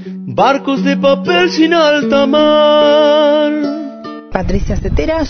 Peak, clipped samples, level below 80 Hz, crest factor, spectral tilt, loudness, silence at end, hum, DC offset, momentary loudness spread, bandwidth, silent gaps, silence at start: 0 dBFS; under 0.1%; -26 dBFS; 12 dB; -6 dB/octave; -11 LUFS; 0 s; none; under 0.1%; 12 LU; 6.6 kHz; none; 0 s